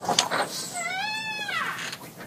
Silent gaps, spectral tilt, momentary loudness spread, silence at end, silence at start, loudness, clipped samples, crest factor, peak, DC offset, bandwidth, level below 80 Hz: none; -1 dB/octave; 8 LU; 0 s; 0 s; -28 LUFS; under 0.1%; 28 dB; 0 dBFS; under 0.1%; 15.5 kHz; -70 dBFS